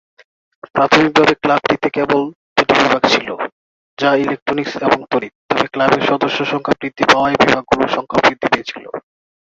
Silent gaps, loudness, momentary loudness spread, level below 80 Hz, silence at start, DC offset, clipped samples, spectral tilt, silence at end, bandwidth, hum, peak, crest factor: 2.35-2.56 s, 3.52-3.97 s, 4.42-4.46 s, 5.35-5.49 s; -15 LUFS; 9 LU; -50 dBFS; 0.75 s; under 0.1%; under 0.1%; -4.5 dB/octave; 0.55 s; 8 kHz; none; 0 dBFS; 16 dB